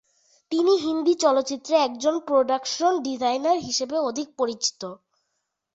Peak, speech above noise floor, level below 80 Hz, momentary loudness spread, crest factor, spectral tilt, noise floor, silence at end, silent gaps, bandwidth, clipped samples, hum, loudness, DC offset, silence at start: -6 dBFS; 55 dB; -68 dBFS; 7 LU; 18 dB; -2.5 dB/octave; -78 dBFS; 0.8 s; none; 8 kHz; under 0.1%; none; -23 LUFS; under 0.1%; 0.5 s